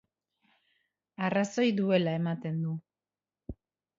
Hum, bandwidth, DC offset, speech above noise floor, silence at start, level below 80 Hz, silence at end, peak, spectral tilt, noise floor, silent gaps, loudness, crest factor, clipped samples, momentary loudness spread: none; 7.8 kHz; under 0.1%; over 61 dB; 1.2 s; -62 dBFS; 0.45 s; -14 dBFS; -6.5 dB/octave; under -90 dBFS; none; -30 LUFS; 20 dB; under 0.1%; 21 LU